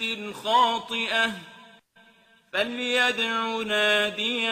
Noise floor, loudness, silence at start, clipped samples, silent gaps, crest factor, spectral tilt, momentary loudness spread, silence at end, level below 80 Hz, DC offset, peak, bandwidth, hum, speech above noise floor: -58 dBFS; -24 LUFS; 0 s; under 0.1%; none; 16 dB; -2 dB/octave; 8 LU; 0 s; -68 dBFS; under 0.1%; -10 dBFS; 15.5 kHz; none; 33 dB